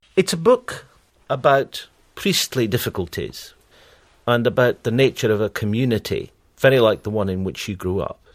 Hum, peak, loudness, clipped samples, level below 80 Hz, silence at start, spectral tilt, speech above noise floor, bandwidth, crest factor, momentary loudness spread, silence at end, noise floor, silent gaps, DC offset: none; -2 dBFS; -20 LUFS; under 0.1%; -50 dBFS; 0.15 s; -5 dB/octave; 33 dB; 16 kHz; 20 dB; 13 LU; 0.2 s; -52 dBFS; none; under 0.1%